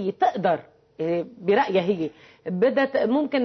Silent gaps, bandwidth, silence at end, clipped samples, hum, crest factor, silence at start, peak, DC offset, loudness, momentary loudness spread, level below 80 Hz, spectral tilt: none; 6.2 kHz; 0 s; under 0.1%; none; 14 dB; 0 s; -10 dBFS; under 0.1%; -24 LUFS; 11 LU; -66 dBFS; -7.5 dB/octave